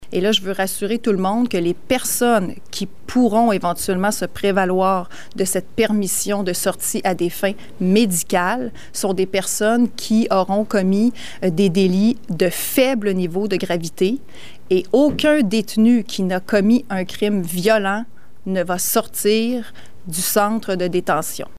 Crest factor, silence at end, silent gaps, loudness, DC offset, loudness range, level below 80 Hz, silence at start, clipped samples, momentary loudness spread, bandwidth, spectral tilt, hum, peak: 16 dB; 0.15 s; none; -19 LUFS; 3%; 2 LU; -52 dBFS; 0 s; under 0.1%; 8 LU; 16 kHz; -4.5 dB/octave; none; -2 dBFS